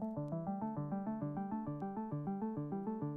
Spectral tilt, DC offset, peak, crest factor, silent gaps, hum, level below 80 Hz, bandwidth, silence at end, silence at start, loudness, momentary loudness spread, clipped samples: -12 dB/octave; under 0.1%; -28 dBFS; 12 dB; none; none; -70 dBFS; 2.8 kHz; 0 s; 0 s; -41 LUFS; 1 LU; under 0.1%